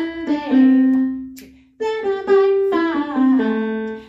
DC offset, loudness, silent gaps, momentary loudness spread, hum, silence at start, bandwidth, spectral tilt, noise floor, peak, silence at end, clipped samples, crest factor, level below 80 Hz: under 0.1%; -17 LUFS; none; 11 LU; none; 0 s; 7.4 kHz; -7 dB/octave; -41 dBFS; -4 dBFS; 0.05 s; under 0.1%; 12 dB; -56 dBFS